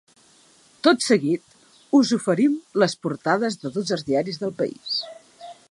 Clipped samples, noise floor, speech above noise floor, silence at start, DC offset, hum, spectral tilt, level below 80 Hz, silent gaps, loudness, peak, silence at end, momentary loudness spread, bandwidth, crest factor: under 0.1%; -55 dBFS; 34 dB; 0.85 s; under 0.1%; none; -4.5 dB/octave; -70 dBFS; none; -22 LUFS; -4 dBFS; 0.2 s; 9 LU; 11.5 kHz; 20 dB